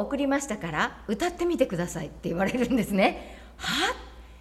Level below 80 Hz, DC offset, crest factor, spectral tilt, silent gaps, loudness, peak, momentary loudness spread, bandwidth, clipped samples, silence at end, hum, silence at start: -48 dBFS; under 0.1%; 20 dB; -4.5 dB/octave; none; -27 LUFS; -8 dBFS; 10 LU; 15 kHz; under 0.1%; 0 s; none; 0 s